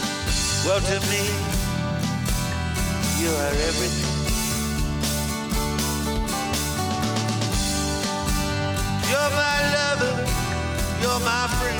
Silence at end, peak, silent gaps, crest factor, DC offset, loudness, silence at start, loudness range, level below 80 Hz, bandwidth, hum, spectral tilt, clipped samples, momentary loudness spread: 0 s; -8 dBFS; none; 16 dB; under 0.1%; -23 LUFS; 0 s; 2 LU; -32 dBFS; over 20 kHz; none; -3.5 dB/octave; under 0.1%; 5 LU